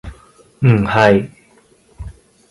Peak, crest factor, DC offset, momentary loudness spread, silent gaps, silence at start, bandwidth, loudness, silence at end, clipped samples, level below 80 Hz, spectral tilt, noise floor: 0 dBFS; 18 dB; under 0.1%; 24 LU; none; 0.05 s; 11.5 kHz; -14 LUFS; 0.4 s; under 0.1%; -40 dBFS; -7.5 dB/octave; -51 dBFS